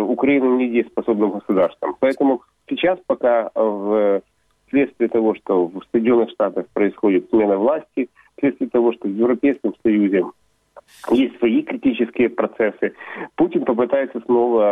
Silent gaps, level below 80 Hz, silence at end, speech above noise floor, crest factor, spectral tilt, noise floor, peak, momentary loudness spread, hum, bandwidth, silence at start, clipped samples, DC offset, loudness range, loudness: none; -60 dBFS; 0 s; 30 dB; 14 dB; -8 dB/octave; -49 dBFS; -4 dBFS; 5 LU; none; 4.9 kHz; 0 s; under 0.1%; under 0.1%; 1 LU; -19 LUFS